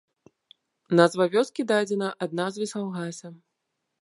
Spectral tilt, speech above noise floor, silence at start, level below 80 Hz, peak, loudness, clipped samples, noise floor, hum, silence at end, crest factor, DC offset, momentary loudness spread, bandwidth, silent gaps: -5.5 dB/octave; 56 dB; 0.9 s; -78 dBFS; -2 dBFS; -25 LUFS; under 0.1%; -80 dBFS; none; 0.7 s; 24 dB; under 0.1%; 14 LU; 11.5 kHz; none